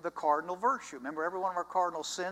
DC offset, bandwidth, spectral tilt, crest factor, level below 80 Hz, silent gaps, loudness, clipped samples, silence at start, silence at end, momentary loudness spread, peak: under 0.1%; 15.5 kHz; -3 dB/octave; 18 dB; -76 dBFS; none; -33 LUFS; under 0.1%; 0 s; 0 s; 5 LU; -16 dBFS